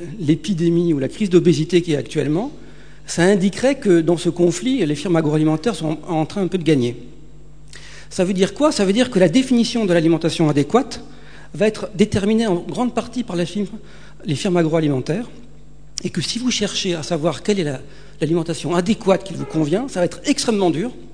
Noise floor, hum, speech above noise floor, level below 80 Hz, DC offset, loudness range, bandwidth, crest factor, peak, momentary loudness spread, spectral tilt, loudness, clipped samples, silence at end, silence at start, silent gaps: -44 dBFS; none; 26 dB; -46 dBFS; 1%; 5 LU; 10 kHz; 18 dB; 0 dBFS; 10 LU; -5.5 dB/octave; -19 LUFS; under 0.1%; 0.05 s; 0 s; none